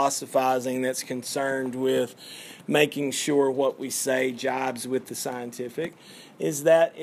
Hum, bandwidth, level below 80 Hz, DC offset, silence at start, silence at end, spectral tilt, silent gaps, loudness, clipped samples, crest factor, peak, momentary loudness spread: none; 15.5 kHz; -80 dBFS; under 0.1%; 0 s; 0 s; -3.5 dB/octave; none; -26 LUFS; under 0.1%; 20 dB; -6 dBFS; 11 LU